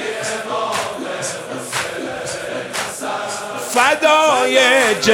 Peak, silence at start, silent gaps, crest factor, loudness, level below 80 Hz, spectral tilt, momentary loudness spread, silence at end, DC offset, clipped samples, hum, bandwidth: 0 dBFS; 0 s; none; 18 dB; -17 LUFS; -58 dBFS; -2 dB/octave; 12 LU; 0 s; under 0.1%; under 0.1%; none; 16.5 kHz